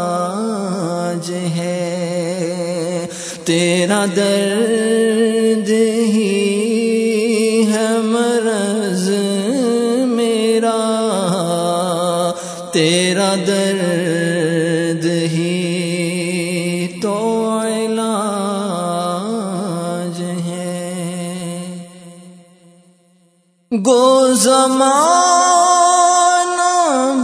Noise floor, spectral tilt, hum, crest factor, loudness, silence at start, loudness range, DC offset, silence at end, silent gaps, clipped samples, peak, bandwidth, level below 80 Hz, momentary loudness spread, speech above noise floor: -56 dBFS; -4.5 dB/octave; none; 16 dB; -16 LUFS; 0 s; 9 LU; under 0.1%; 0 s; none; under 0.1%; 0 dBFS; 11 kHz; -66 dBFS; 11 LU; 43 dB